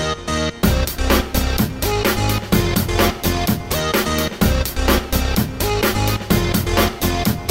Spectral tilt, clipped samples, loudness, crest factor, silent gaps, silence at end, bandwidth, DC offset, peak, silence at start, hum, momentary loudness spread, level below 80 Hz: -4.5 dB/octave; under 0.1%; -18 LUFS; 16 dB; none; 0 s; 16.5 kHz; under 0.1%; -2 dBFS; 0 s; none; 3 LU; -24 dBFS